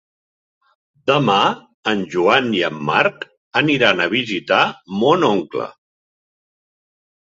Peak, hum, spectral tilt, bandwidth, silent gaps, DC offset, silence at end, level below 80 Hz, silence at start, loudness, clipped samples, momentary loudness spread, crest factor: 0 dBFS; none; -5 dB/octave; 7.8 kHz; 1.74-1.83 s, 3.37-3.51 s; under 0.1%; 1.55 s; -60 dBFS; 1.05 s; -17 LUFS; under 0.1%; 10 LU; 18 dB